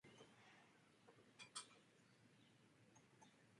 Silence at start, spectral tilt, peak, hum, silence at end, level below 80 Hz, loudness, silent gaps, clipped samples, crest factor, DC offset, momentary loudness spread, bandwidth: 0.05 s; -2 dB/octave; -38 dBFS; none; 0 s; under -90 dBFS; -60 LUFS; none; under 0.1%; 28 dB; under 0.1%; 12 LU; 11 kHz